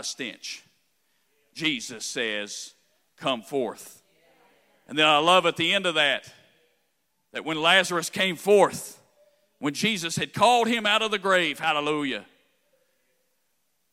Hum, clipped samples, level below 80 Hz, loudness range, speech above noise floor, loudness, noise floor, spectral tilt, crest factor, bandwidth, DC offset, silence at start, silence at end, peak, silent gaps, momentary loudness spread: none; under 0.1%; -74 dBFS; 8 LU; 50 dB; -23 LUFS; -75 dBFS; -3 dB/octave; 22 dB; 16 kHz; under 0.1%; 0 s; 1.7 s; -4 dBFS; none; 17 LU